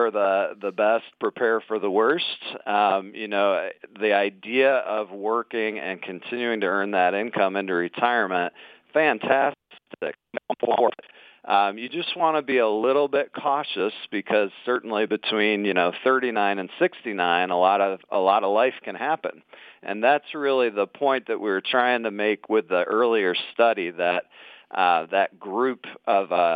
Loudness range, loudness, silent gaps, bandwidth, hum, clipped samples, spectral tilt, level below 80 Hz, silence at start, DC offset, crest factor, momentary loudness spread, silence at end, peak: 2 LU; -23 LUFS; none; 5 kHz; none; under 0.1%; -7 dB/octave; -82 dBFS; 0 s; under 0.1%; 18 dB; 8 LU; 0 s; -4 dBFS